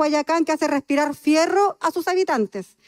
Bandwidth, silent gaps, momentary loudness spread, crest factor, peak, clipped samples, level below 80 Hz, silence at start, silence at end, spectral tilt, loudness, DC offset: 16 kHz; none; 5 LU; 12 dB; -8 dBFS; under 0.1%; -68 dBFS; 0 s; 0.25 s; -3.5 dB/octave; -21 LUFS; under 0.1%